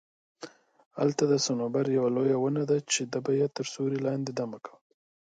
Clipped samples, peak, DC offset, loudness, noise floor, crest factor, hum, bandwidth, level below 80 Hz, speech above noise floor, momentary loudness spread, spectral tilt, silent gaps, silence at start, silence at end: under 0.1%; -12 dBFS; under 0.1%; -28 LUFS; -49 dBFS; 16 dB; none; 9.4 kHz; -76 dBFS; 21 dB; 21 LU; -5 dB/octave; 0.86-0.91 s; 0.4 s; 0.7 s